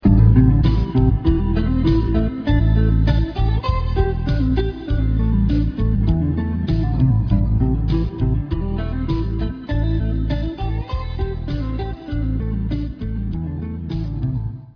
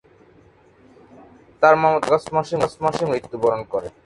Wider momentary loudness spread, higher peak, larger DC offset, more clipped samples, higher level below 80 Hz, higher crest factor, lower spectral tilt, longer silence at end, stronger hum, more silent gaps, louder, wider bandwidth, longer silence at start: about the same, 9 LU vs 9 LU; about the same, -2 dBFS vs 0 dBFS; neither; neither; first, -22 dBFS vs -56 dBFS; about the same, 16 dB vs 20 dB; first, -10 dB/octave vs -6 dB/octave; about the same, 0.05 s vs 0.15 s; neither; neither; about the same, -20 LUFS vs -20 LUFS; second, 5.4 kHz vs 11.5 kHz; second, 0 s vs 1.6 s